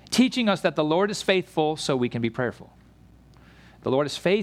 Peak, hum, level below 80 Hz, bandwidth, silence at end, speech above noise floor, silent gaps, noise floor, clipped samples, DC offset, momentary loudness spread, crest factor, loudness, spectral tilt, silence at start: -8 dBFS; none; -58 dBFS; 15 kHz; 0 s; 29 dB; none; -53 dBFS; under 0.1%; under 0.1%; 6 LU; 18 dB; -24 LUFS; -5 dB/octave; 0.1 s